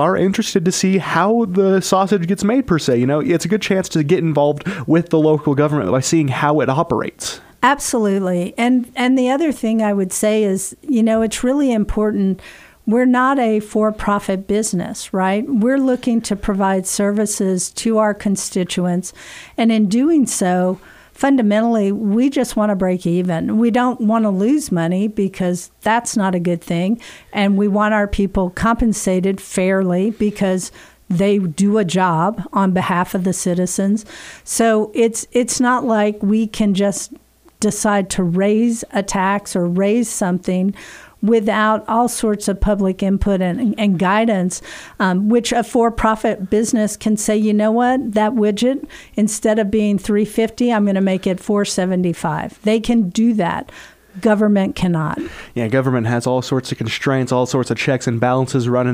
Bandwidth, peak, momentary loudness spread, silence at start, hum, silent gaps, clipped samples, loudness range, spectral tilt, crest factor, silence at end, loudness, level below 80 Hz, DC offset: 16 kHz; 0 dBFS; 6 LU; 0 s; none; none; under 0.1%; 2 LU; -5.5 dB/octave; 16 dB; 0 s; -17 LUFS; -40 dBFS; under 0.1%